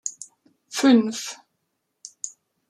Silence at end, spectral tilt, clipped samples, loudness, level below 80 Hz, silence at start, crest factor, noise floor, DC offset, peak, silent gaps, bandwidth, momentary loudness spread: 0.4 s; -3.5 dB/octave; under 0.1%; -21 LUFS; -80 dBFS; 0.05 s; 20 dB; -76 dBFS; under 0.1%; -6 dBFS; none; 14 kHz; 25 LU